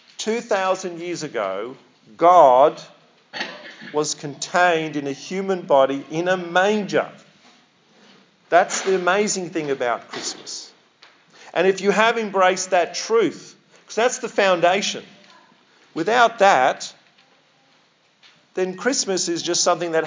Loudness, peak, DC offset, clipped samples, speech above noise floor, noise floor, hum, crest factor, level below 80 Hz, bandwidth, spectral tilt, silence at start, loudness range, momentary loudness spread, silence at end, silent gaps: -20 LUFS; 0 dBFS; under 0.1%; under 0.1%; 40 dB; -59 dBFS; none; 20 dB; -84 dBFS; 7.8 kHz; -3 dB/octave; 0.2 s; 4 LU; 15 LU; 0 s; none